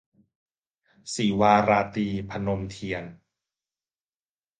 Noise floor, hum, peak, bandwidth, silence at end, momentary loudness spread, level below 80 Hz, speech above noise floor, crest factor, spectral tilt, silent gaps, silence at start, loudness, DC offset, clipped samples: under -90 dBFS; none; -6 dBFS; 9.6 kHz; 1.45 s; 15 LU; -54 dBFS; over 66 dB; 22 dB; -5.5 dB/octave; none; 1.05 s; -25 LUFS; under 0.1%; under 0.1%